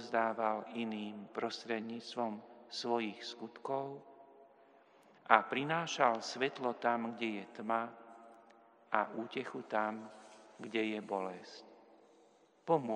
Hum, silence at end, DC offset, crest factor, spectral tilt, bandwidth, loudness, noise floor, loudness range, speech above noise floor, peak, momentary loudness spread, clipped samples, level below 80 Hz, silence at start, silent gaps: none; 0 s; under 0.1%; 30 dB; -4.5 dB/octave; 10.5 kHz; -37 LUFS; -67 dBFS; 7 LU; 30 dB; -8 dBFS; 19 LU; under 0.1%; under -90 dBFS; 0 s; none